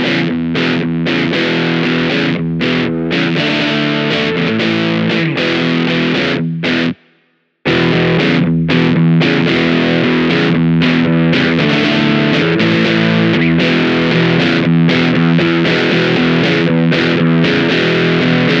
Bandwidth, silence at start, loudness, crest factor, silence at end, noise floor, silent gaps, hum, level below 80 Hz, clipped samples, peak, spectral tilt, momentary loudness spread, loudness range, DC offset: 7.4 kHz; 0 s; -12 LUFS; 12 dB; 0 s; -58 dBFS; none; none; -46 dBFS; under 0.1%; 0 dBFS; -7 dB/octave; 4 LU; 3 LU; under 0.1%